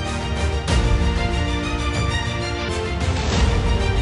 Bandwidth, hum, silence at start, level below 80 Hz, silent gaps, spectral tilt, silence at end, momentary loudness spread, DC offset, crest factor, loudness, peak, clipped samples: 11.5 kHz; none; 0 s; -24 dBFS; none; -5 dB/octave; 0 s; 5 LU; under 0.1%; 14 dB; -22 LUFS; -6 dBFS; under 0.1%